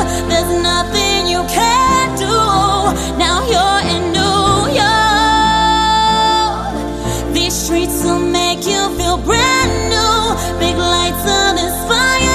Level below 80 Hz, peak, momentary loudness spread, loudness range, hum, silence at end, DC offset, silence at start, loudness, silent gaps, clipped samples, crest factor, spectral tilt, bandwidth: -26 dBFS; 0 dBFS; 5 LU; 2 LU; none; 0 s; under 0.1%; 0 s; -13 LUFS; none; under 0.1%; 12 dB; -3 dB/octave; 14 kHz